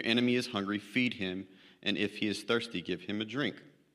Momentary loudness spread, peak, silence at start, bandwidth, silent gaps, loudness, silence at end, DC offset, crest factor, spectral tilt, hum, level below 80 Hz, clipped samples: 8 LU; -12 dBFS; 0 s; 13 kHz; none; -33 LUFS; 0.25 s; under 0.1%; 22 dB; -5 dB/octave; none; -76 dBFS; under 0.1%